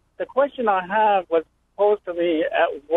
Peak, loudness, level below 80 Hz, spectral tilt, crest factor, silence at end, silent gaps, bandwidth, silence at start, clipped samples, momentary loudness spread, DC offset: -6 dBFS; -21 LUFS; -62 dBFS; -7 dB/octave; 16 dB; 0 s; none; 4 kHz; 0.2 s; under 0.1%; 5 LU; under 0.1%